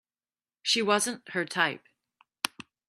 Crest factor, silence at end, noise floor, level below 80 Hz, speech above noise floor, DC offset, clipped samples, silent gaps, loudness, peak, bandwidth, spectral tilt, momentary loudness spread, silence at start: 26 dB; 0.4 s; under -90 dBFS; -78 dBFS; over 62 dB; under 0.1%; under 0.1%; none; -28 LUFS; -6 dBFS; 14 kHz; -2 dB/octave; 10 LU; 0.65 s